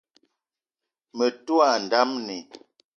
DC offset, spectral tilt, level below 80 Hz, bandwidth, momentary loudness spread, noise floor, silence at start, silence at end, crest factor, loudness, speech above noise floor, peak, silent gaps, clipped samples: under 0.1%; -3 dB/octave; -80 dBFS; 7.2 kHz; 16 LU; -88 dBFS; 1.15 s; 0.4 s; 22 dB; -23 LUFS; 65 dB; -6 dBFS; none; under 0.1%